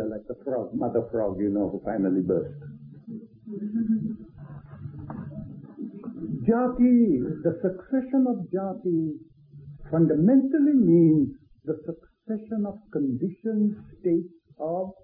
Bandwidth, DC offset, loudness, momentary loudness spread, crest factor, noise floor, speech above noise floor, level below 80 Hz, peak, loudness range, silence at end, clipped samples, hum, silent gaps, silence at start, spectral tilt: 2.7 kHz; under 0.1%; -25 LUFS; 21 LU; 16 dB; -46 dBFS; 22 dB; -56 dBFS; -10 dBFS; 9 LU; 0.1 s; under 0.1%; none; none; 0 s; -14.5 dB/octave